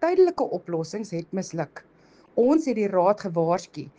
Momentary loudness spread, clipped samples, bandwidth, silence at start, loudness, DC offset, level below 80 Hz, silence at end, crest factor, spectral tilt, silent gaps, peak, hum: 11 LU; under 0.1%; 9.2 kHz; 0 s; -25 LUFS; under 0.1%; -66 dBFS; 0.1 s; 16 dB; -6.5 dB/octave; none; -8 dBFS; none